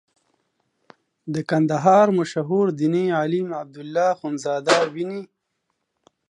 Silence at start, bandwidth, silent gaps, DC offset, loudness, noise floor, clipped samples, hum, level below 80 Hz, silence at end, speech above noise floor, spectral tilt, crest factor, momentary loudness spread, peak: 1.25 s; 11 kHz; none; under 0.1%; -21 LUFS; -75 dBFS; under 0.1%; none; -72 dBFS; 1.05 s; 55 dB; -6 dB/octave; 18 dB; 14 LU; -4 dBFS